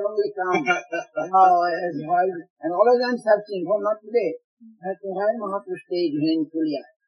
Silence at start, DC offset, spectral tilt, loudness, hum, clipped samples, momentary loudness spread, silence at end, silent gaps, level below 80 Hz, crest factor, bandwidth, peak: 0 s; under 0.1%; -6 dB/octave; -23 LUFS; none; under 0.1%; 12 LU; 0.25 s; 2.50-2.56 s, 4.44-4.57 s; -86 dBFS; 18 dB; 10.5 kHz; -4 dBFS